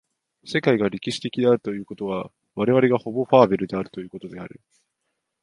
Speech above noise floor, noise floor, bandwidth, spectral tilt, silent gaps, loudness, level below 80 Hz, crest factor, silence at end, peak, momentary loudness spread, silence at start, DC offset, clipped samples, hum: 56 dB; -78 dBFS; 11.5 kHz; -6.5 dB/octave; none; -22 LUFS; -60 dBFS; 22 dB; 0.95 s; 0 dBFS; 19 LU; 0.45 s; under 0.1%; under 0.1%; none